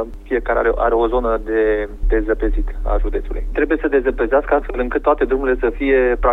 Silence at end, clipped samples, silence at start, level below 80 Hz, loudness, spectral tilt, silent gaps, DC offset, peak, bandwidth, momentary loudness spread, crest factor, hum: 0 s; under 0.1%; 0 s; -24 dBFS; -18 LUFS; -8.5 dB/octave; none; under 0.1%; -4 dBFS; 4 kHz; 7 LU; 14 dB; none